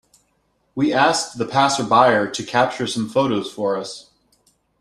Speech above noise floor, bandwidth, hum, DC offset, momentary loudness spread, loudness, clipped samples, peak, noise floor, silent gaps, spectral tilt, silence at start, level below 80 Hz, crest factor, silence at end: 47 dB; 13 kHz; none; under 0.1%; 11 LU; -19 LUFS; under 0.1%; -2 dBFS; -66 dBFS; none; -4 dB/octave; 0.75 s; -60 dBFS; 20 dB; 0.8 s